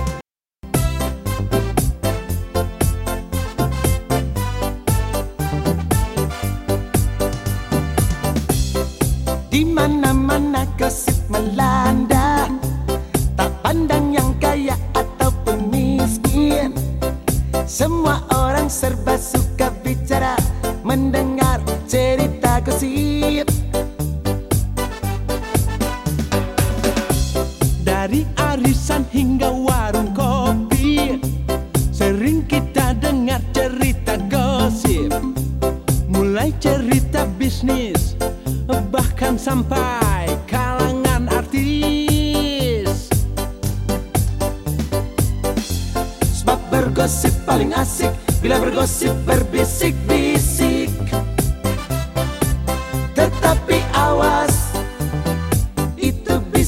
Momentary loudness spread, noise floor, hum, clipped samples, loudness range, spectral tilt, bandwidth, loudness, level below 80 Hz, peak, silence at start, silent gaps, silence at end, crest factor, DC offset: 6 LU; -40 dBFS; none; under 0.1%; 3 LU; -5.5 dB/octave; 17 kHz; -19 LUFS; -26 dBFS; 0 dBFS; 0 s; none; 0 s; 18 dB; under 0.1%